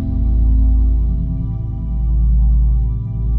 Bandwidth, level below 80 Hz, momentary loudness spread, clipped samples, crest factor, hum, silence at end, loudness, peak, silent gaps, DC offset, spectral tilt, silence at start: 1.2 kHz; -14 dBFS; 7 LU; under 0.1%; 10 dB; none; 0 s; -18 LUFS; -4 dBFS; none; under 0.1%; -13 dB/octave; 0 s